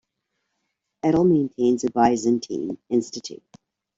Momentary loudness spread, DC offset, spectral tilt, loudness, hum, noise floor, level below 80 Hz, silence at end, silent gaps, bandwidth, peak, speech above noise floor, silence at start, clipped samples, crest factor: 13 LU; under 0.1%; -6.5 dB/octave; -22 LUFS; none; -78 dBFS; -58 dBFS; 0.6 s; none; 7.8 kHz; -6 dBFS; 56 dB; 1.05 s; under 0.1%; 18 dB